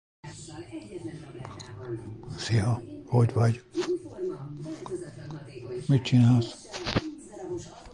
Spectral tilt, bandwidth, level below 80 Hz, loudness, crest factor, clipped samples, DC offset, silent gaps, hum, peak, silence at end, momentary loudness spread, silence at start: -7 dB/octave; 10 kHz; -54 dBFS; -28 LUFS; 20 dB; under 0.1%; under 0.1%; none; none; -10 dBFS; 0 s; 19 LU; 0.25 s